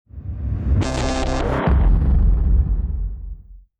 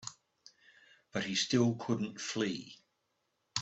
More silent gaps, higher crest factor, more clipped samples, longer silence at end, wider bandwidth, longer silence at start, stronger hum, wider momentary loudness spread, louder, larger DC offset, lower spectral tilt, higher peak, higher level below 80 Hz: neither; second, 12 dB vs 22 dB; neither; first, 0.2 s vs 0 s; about the same, 9 kHz vs 8.2 kHz; first, 0.15 s vs 0 s; neither; about the same, 15 LU vs 14 LU; first, -21 LUFS vs -34 LUFS; neither; first, -7 dB/octave vs -4 dB/octave; first, -6 dBFS vs -16 dBFS; first, -20 dBFS vs -74 dBFS